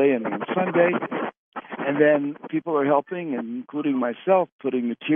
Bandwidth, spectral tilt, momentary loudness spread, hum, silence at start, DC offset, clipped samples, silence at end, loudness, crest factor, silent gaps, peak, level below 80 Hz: 3.7 kHz; -10.5 dB/octave; 10 LU; none; 0 s; under 0.1%; under 0.1%; 0 s; -24 LUFS; 18 dB; 1.37-1.52 s, 4.52-4.59 s; -6 dBFS; -80 dBFS